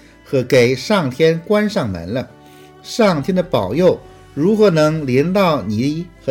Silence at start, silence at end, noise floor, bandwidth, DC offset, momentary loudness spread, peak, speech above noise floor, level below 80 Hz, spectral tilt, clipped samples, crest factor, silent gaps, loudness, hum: 0.3 s; 0 s; -41 dBFS; 17 kHz; under 0.1%; 11 LU; -2 dBFS; 26 dB; -48 dBFS; -6.5 dB/octave; under 0.1%; 14 dB; none; -16 LUFS; none